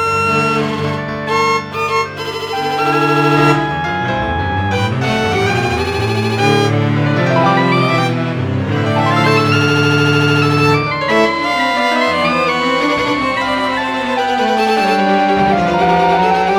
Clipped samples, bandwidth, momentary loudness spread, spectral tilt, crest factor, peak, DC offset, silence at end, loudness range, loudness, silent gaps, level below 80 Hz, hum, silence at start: under 0.1%; 18.5 kHz; 5 LU; -6 dB/octave; 14 dB; 0 dBFS; under 0.1%; 0 s; 2 LU; -14 LUFS; none; -40 dBFS; none; 0 s